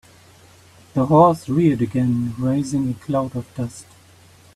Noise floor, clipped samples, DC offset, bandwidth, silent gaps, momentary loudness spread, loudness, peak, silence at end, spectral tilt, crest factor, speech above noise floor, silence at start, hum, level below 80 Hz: -49 dBFS; under 0.1%; under 0.1%; 13.5 kHz; none; 15 LU; -20 LUFS; 0 dBFS; 0.75 s; -8 dB/octave; 20 dB; 30 dB; 0.95 s; none; -52 dBFS